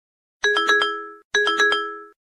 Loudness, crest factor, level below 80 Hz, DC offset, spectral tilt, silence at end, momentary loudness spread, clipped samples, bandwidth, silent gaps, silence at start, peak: -19 LUFS; 18 dB; -70 dBFS; under 0.1%; 0.5 dB/octave; 0.2 s; 9 LU; under 0.1%; 12 kHz; 1.24-1.31 s; 0.45 s; -6 dBFS